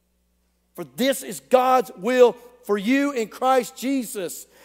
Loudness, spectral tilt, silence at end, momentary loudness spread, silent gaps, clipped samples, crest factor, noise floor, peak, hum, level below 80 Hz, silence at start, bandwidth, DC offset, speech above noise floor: -21 LUFS; -4 dB/octave; 0.2 s; 14 LU; none; under 0.1%; 20 dB; -67 dBFS; -2 dBFS; none; -68 dBFS; 0.8 s; 16 kHz; under 0.1%; 46 dB